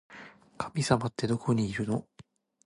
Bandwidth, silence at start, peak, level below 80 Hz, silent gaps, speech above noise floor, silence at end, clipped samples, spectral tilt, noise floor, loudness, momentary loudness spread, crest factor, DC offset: 11.5 kHz; 0.1 s; -10 dBFS; -58 dBFS; none; 29 dB; 0.65 s; under 0.1%; -6 dB/octave; -58 dBFS; -30 LUFS; 14 LU; 22 dB; under 0.1%